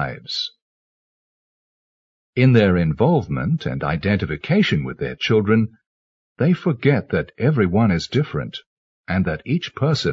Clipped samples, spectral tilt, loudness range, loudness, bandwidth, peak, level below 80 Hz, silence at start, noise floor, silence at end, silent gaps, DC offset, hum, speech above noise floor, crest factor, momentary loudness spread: under 0.1%; -7.5 dB/octave; 2 LU; -20 LUFS; 7.6 kHz; -2 dBFS; -46 dBFS; 0 s; under -90 dBFS; 0 s; 0.62-2.33 s, 5.86-6.36 s, 8.66-9.04 s; under 0.1%; none; over 71 dB; 18 dB; 9 LU